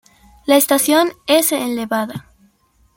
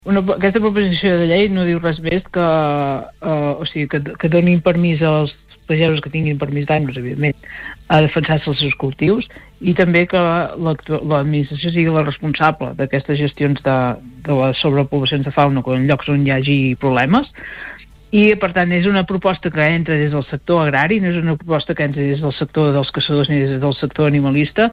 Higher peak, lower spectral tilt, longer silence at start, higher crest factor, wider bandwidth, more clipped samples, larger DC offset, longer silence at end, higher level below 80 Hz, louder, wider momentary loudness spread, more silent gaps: about the same, 0 dBFS vs -2 dBFS; second, -2.5 dB/octave vs -9 dB/octave; first, 0.45 s vs 0.05 s; about the same, 18 dB vs 14 dB; first, 17 kHz vs 5.2 kHz; neither; neither; first, 0.75 s vs 0 s; second, -56 dBFS vs -42 dBFS; about the same, -15 LUFS vs -16 LUFS; first, 14 LU vs 7 LU; neither